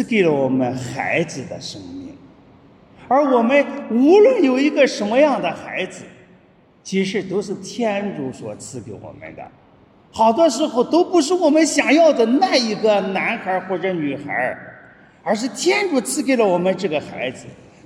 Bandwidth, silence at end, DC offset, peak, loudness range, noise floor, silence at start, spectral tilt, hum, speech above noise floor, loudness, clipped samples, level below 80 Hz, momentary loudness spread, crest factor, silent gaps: 13 kHz; 0.3 s; under 0.1%; 0 dBFS; 9 LU; -52 dBFS; 0 s; -4.5 dB/octave; none; 34 dB; -18 LUFS; under 0.1%; -62 dBFS; 19 LU; 18 dB; none